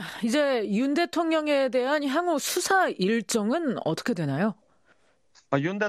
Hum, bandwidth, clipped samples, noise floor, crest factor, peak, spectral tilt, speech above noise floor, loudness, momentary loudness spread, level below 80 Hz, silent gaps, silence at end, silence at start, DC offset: none; 14.5 kHz; under 0.1%; -65 dBFS; 16 dB; -10 dBFS; -4.5 dB/octave; 40 dB; -25 LUFS; 5 LU; -72 dBFS; none; 0 s; 0 s; under 0.1%